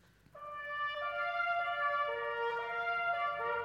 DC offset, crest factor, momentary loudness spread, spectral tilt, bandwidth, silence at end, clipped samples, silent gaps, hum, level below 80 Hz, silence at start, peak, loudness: under 0.1%; 14 dB; 7 LU; -3 dB/octave; 13.5 kHz; 0 s; under 0.1%; none; none; -72 dBFS; 0.35 s; -24 dBFS; -35 LUFS